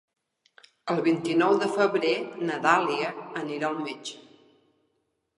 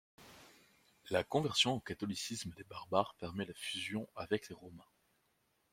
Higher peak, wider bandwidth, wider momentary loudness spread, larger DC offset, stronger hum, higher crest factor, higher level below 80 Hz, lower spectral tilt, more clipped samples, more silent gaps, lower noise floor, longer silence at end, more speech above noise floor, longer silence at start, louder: first, -6 dBFS vs -16 dBFS; second, 11 kHz vs 16.5 kHz; second, 12 LU vs 20 LU; neither; neither; about the same, 22 dB vs 24 dB; second, -80 dBFS vs -72 dBFS; about the same, -5 dB/octave vs -4 dB/octave; neither; neither; about the same, -76 dBFS vs -78 dBFS; first, 1.2 s vs 0.9 s; first, 50 dB vs 40 dB; first, 0.85 s vs 0.2 s; first, -26 LUFS vs -38 LUFS